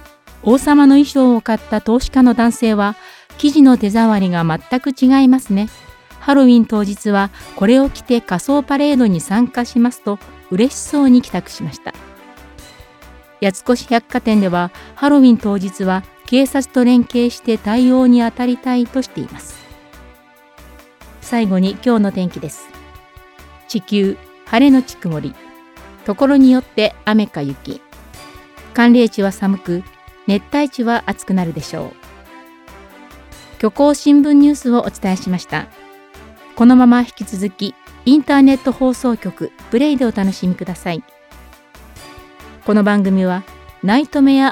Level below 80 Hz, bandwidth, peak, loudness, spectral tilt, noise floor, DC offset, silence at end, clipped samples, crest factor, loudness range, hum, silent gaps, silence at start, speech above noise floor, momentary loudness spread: -42 dBFS; 14 kHz; 0 dBFS; -14 LUFS; -6 dB/octave; -45 dBFS; under 0.1%; 0 s; under 0.1%; 14 dB; 7 LU; none; none; 0.45 s; 32 dB; 15 LU